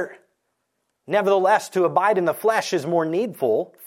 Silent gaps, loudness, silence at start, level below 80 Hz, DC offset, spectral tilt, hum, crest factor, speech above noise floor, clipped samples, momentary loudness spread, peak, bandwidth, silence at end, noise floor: none; -21 LUFS; 0 s; -76 dBFS; under 0.1%; -5 dB/octave; none; 16 dB; 55 dB; under 0.1%; 5 LU; -6 dBFS; 16.5 kHz; 0 s; -75 dBFS